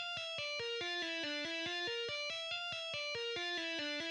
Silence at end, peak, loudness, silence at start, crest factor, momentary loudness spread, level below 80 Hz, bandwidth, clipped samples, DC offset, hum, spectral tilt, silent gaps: 0 s; -28 dBFS; -39 LUFS; 0 s; 12 dB; 1 LU; -80 dBFS; 11 kHz; under 0.1%; under 0.1%; none; -1.5 dB/octave; none